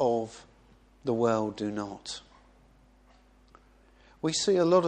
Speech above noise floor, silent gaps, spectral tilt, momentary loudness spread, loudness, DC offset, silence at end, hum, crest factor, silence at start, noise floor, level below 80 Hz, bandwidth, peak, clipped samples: 33 dB; none; -5 dB/octave; 16 LU; -30 LUFS; under 0.1%; 0 s; none; 20 dB; 0 s; -60 dBFS; -62 dBFS; 10 kHz; -10 dBFS; under 0.1%